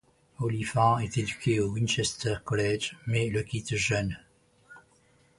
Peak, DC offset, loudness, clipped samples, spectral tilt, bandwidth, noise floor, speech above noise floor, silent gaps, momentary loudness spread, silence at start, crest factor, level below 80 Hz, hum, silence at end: -10 dBFS; under 0.1%; -29 LUFS; under 0.1%; -5 dB/octave; 11.5 kHz; -63 dBFS; 35 dB; none; 8 LU; 0.4 s; 20 dB; -52 dBFS; none; 0.6 s